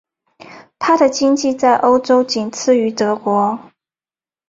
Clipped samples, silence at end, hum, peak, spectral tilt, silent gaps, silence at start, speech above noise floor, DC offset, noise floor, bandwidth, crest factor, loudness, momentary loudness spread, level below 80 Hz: under 0.1%; 0.9 s; none; -2 dBFS; -4 dB/octave; none; 0.5 s; over 76 dB; under 0.1%; under -90 dBFS; 7.8 kHz; 14 dB; -15 LUFS; 7 LU; -60 dBFS